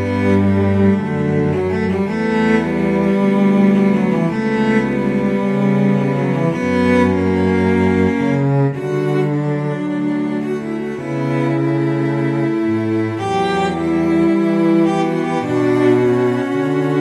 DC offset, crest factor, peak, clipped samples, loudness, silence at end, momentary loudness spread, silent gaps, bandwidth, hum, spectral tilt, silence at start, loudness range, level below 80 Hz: under 0.1%; 14 dB; -2 dBFS; under 0.1%; -16 LUFS; 0 s; 5 LU; none; 11 kHz; none; -8 dB/octave; 0 s; 3 LU; -48 dBFS